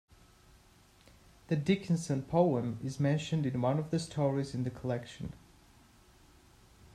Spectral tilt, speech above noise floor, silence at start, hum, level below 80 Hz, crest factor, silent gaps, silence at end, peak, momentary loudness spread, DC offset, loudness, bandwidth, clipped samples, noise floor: -7 dB/octave; 30 dB; 1.5 s; none; -62 dBFS; 20 dB; none; 1.6 s; -14 dBFS; 9 LU; under 0.1%; -33 LUFS; 12.5 kHz; under 0.1%; -62 dBFS